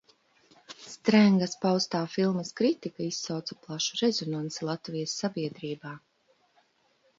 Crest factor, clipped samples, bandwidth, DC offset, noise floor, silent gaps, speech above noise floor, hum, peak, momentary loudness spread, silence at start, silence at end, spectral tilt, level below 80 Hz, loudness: 22 dB; under 0.1%; 7.8 kHz; under 0.1%; -68 dBFS; none; 40 dB; none; -8 dBFS; 16 LU; 0.7 s; 1.2 s; -5 dB/octave; -74 dBFS; -28 LUFS